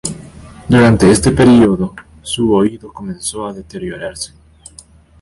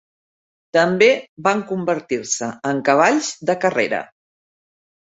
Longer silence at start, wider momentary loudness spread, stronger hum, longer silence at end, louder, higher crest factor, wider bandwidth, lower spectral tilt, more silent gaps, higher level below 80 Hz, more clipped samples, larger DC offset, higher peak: second, 0.05 s vs 0.75 s; first, 20 LU vs 8 LU; neither; about the same, 0.95 s vs 1 s; first, -12 LUFS vs -19 LUFS; about the same, 14 dB vs 18 dB; first, 11.5 kHz vs 8.2 kHz; first, -5.5 dB/octave vs -4 dB/octave; second, none vs 1.29-1.37 s; first, -34 dBFS vs -64 dBFS; neither; neither; about the same, 0 dBFS vs -2 dBFS